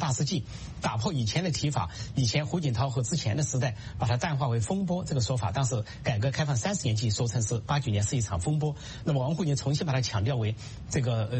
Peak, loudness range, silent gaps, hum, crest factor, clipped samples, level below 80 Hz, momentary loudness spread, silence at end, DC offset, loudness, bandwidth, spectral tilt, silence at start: -12 dBFS; 1 LU; none; none; 16 dB; under 0.1%; -48 dBFS; 5 LU; 0 s; under 0.1%; -29 LUFS; 8.8 kHz; -5 dB/octave; 0 s